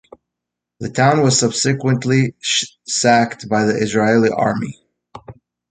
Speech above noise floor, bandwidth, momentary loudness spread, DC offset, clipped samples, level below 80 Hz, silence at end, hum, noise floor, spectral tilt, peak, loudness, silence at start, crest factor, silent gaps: 66 dB; 9.6 kHz; 7 LU; under 0.1%; under 0.1%; -54 dBFS; 0.4 s; none; -82 dBFS; -4.5 dB/octave; 0 dBFS; -16 LUFS; 0.8 s; 16 dB; none